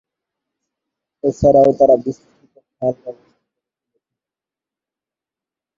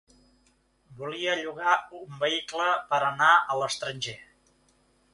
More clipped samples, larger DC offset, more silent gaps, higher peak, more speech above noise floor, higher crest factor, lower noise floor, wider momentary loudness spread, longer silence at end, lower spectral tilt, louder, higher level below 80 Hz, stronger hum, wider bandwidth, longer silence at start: neither; neither; neither; first, -2 dBFS vs -6 dBFS; first, 74 dB vs 40 dB; about the same, 18 dB vs 22 dB; first, -88 dBFS vs -66 dBFS; first, 22 LU vs 16 LU; first, 2.65 s vs 0.9 s; first, -9 dB/octave vs -2.5 dB/octave; first, -15 LUFS vs -26 LUFS; first, -46 dBFS vs -70 dBFS; neither; second, 7.4 kHz vs 11.5 kHz; first, 1.25 s vs 0.9 s